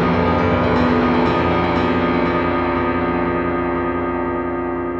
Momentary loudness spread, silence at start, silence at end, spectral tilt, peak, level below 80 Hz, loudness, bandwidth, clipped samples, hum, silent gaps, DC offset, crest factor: 5 LU; 0 s; 0 s; -8.5 dB/octave; -4 dBFS; -36 dBFS; -18 LUFS; 6.8 kHz; under 0.1%; none; none; under 0.1%; 12 dB